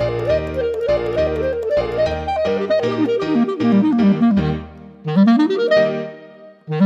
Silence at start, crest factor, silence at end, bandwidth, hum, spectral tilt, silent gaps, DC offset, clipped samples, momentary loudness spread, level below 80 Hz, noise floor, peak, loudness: 0 s; 12 dB; 0 s; 7.8 kHz; none; -8 dB/octave; none; under 0.1%; under 0.1%; 9 LU; -38 dBFS; -41 dBFS; -4 dBFS; -18 LUFS